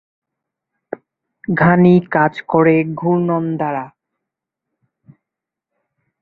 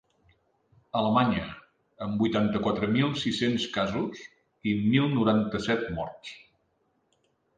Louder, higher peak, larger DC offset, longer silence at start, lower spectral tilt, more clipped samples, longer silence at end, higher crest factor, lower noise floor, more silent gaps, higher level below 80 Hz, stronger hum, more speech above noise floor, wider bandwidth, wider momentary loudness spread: first, -15 LUFS vs -27 LUFS; first, -2 dBFS vs -10 dBFS; neither; first, 1.5 s vs 0.95 s; first, -10.5 dB/octave vs -6.5 dB/octave; neither; first, 2.35 s vs 1.2 s; about the same, 16 dB vs 20 dB; first, -84 dBFS vs -72 dBFS; neither; about the same, -56 dBFS vs -56 dBFS; neither; first, 70 dB vs 46 dB; second, 4.6 kHz vs 9.2 kHz; first, 21 LU vs 14 LU